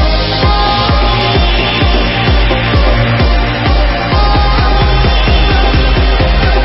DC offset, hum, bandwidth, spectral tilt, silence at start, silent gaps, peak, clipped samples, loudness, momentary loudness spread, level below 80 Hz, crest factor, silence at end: under 0.1%; none; 5.8 kHz; -9 dB/octave; 0 s; none; 0 dBFS; under 0.1%; -11 LUFS; 2 LU; -12 dBFS; 10 dB; 0 s